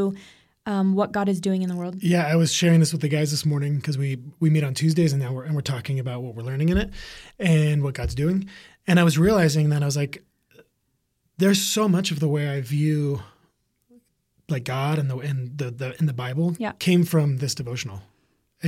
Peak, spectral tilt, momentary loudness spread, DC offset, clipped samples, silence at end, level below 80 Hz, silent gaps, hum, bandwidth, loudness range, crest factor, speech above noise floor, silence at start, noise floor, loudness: -6 dBFS; -6 dB/octave; 12 LU; under 0.1%; under 0.1%; 0 s; -46 dBFS; none; none; 15.5 kHz; 5 LU; 18 dB; 50 dB; 0 s; -73 dBFS; -23 LUFS